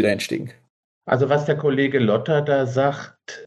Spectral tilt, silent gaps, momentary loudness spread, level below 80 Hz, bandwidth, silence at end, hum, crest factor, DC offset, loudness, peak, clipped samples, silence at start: -6.5 dB/octave; 0.70-1.01 s; 15 LU; -66 dBFS; 12.5 kHz; 0 s; none; 16 dB; under 0.1%; -20 LUFS; -4 dBFS; under 0.1%; 0 s